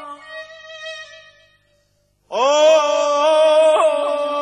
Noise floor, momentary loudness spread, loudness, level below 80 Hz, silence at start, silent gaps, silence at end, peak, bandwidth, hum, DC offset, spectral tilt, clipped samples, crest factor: -63 dBFS; 21 LU; -15 LUFS; -68 dBFS; 0 s; none; 0 s; -2 dBFS; 10.5 kHz; 50 Hz at -65 dBFS; under 0.1%; -0.5 dB/octave; under 0.1%; 14 dB